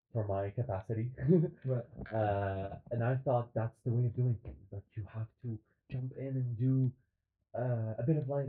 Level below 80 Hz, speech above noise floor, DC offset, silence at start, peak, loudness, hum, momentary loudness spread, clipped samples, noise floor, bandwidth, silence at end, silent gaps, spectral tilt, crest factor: -62 dBFS; 44 dB; under 0.1%; 0.15 s; -16 dBFS; -35 LUFS; none; 13 LU; under 0.1%; -78 dBFS; 4 kHz; 0 s; none; -10 dB/octave; 18 dB